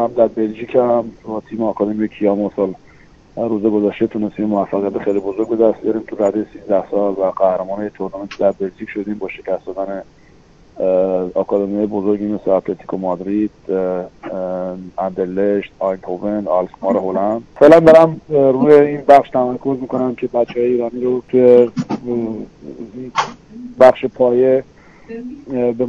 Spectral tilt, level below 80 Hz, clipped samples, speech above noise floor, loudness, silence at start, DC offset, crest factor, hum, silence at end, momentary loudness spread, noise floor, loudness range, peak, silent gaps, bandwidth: -7.5 dB/octave; -52 dBFS; 0.4%; 31 dB; -16 LUFS; 0 s; under 0.1%; 16 dB; none; 0 s; 15 LU; -46 dBFS; 9 LU; 0 dBFS; none; 9 kHz